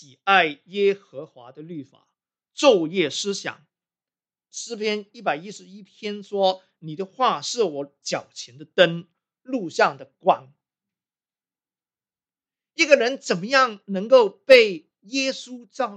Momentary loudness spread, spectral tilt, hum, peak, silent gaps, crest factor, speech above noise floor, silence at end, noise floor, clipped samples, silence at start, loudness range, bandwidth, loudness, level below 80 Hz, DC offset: 21 LU; -3.5 dB/octave; none; 0 dBFS; none; 24 dB; over 68 dB; 0 s; under -90 dBFS; under 0.1%; 0.25 s; 9 LU; 9.2 kHz; -21 LUFS; -74 dBFS; under 0.1%